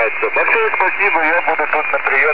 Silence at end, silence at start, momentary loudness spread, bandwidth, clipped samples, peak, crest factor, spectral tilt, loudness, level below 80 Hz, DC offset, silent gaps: 0 s; 0 s; 3 LU; 5.2 kHz; under 0.1%; -2 dBFS; 14 dB; -5.5 dB/octave; -14 LUFS; -58 dBFS; 4%; none